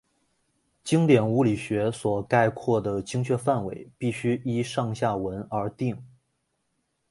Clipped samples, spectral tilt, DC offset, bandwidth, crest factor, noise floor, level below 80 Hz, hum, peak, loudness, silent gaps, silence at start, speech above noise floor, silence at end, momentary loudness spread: under 0.1%; -7 dB/octave; under 0.1%; 11.5 kHz; 20 dB; -75 dBFS; -58 dBFS; none; -6 dBFS; -26 LUFS; none; 0.85 s; 50 dB; 1.05 s; 11 LU